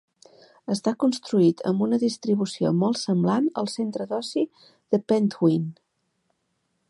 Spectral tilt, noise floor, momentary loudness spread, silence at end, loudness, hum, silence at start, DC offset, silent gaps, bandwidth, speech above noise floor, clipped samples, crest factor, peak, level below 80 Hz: -6.5 dB/octave; -74 dBFS; 8 LU; 1.15 s; -24 LUFS; none; 0.7 s; under 0.1%; none; 11.5 kHz; 51 dB; under 0.1%; 18 dB; -8 dBFS; -72 dBFS